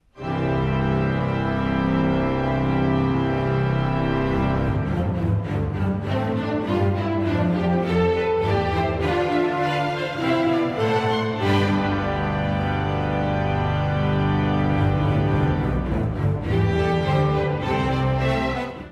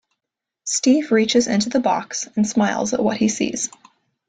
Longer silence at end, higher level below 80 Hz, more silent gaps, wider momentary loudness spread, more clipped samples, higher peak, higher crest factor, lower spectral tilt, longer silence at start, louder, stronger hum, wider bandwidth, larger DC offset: second, 0 s vs 0.6 s; first, -36 dBFS vs -60 dBFS; neither; second, 3 LU vs 8 LU; neither; second, -8 dBFS vs -4 dBFS; about the same, 14 dB vs 16 dB; first, -8 dB/octave vs -3.5 dB/octave; second, 0.15 s vs 0.65 s; second, -22 LUFS vs -19 LUFS; neither; about the same, 9.8 kHz vs 9.6 kHz; neither